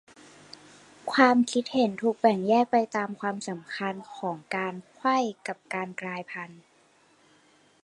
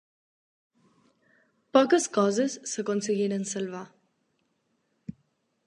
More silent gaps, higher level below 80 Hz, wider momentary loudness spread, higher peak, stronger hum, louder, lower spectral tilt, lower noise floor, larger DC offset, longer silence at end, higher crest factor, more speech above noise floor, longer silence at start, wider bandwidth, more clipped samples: neither; about the same, -78 dBFS vs -76 dBFS; second, 17 LU vs 23 LU; about the same, -4 dBFS vs -6 dBFS; neither; about the same, -27 LUFS vs -26 LUFS; about the same, -5 dB/octave vs -4.5 dB/octave; second, -62 dBFS vs -74 dBFS; neither; first, 1.3 s vs 0.55 s; about the same, 24 dB vs 24 dB; second, 35 dB vs 48 dB; second, 1.05 s vs 1.75 s; about the same, 11.5 kHz vs 11.5 kHz; neither